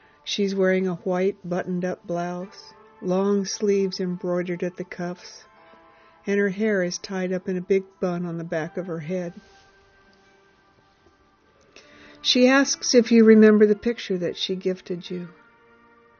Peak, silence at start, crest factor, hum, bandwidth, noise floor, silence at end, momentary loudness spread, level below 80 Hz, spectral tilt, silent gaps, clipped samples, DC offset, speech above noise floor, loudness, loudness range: -4 dBFS; 0.25 s; 20 dB; none; 6.8 kHz; -59 dBFS; 0.9 s; 16 LU; -64 dBFS; -4.5 dB/octave; none; under 0.1%; under 0.1%; 37 dB; -23 LUFS; 13 LU